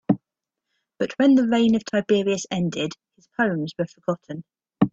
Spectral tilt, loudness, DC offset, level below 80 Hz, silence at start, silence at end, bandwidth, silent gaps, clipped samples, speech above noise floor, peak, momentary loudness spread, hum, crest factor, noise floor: -6 dB/octave; -23 LUFS; under 0.1%; -60 dBFS; 0.1 s; 0.05 s; 7.8 kHz; none; under 0.1%; 63 dB; -4 dBFS; 13 LU; none; 20 dB; -85 dBFS